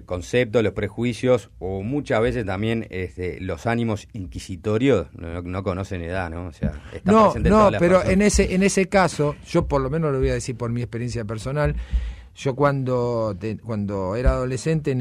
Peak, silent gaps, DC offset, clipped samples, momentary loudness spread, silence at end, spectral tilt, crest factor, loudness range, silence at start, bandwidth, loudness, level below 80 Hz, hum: -6 dBFS; none; under 0.1%; under 0.1%; 13 LU; 0 s; -6 dB/octave; 16 dB; 7 LU; 0 s; 13 kHz; -22 LUFS; -34 dBFS; none